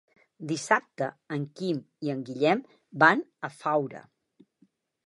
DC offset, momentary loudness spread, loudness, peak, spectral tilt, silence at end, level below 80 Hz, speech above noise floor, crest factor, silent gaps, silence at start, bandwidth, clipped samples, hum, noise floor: under 0.1%; 17 LU; -28 LUFS; -4 dBFS; -5 dB/octave; 1.05 s; -82 dBFS; 39 dB; 24 dB; none; 0.4 s; 11.5 kHz; under 0.1%; none; -67 dBFS